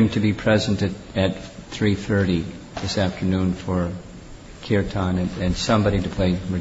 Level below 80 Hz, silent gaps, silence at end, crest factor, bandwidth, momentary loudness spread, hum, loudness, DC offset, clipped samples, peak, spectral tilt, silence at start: -40 dBFS; none; 0 s; 16 dB; 8 kHz; 15 LU; none; -23 LUFS; under 0.1%; under 0.1%; -6 dBFS; -6.5 dB/octave; 0 s